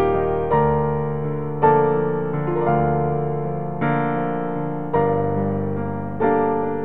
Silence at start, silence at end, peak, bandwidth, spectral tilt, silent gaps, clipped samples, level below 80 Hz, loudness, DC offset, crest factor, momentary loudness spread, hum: 0 s; 0 s; -4 dBFS; 3.8 kHz; -11.5 dB/octave; none; under 0.1%; -42 dBFS; -21 LUFS; 2%; 16 dB; 7 LU; none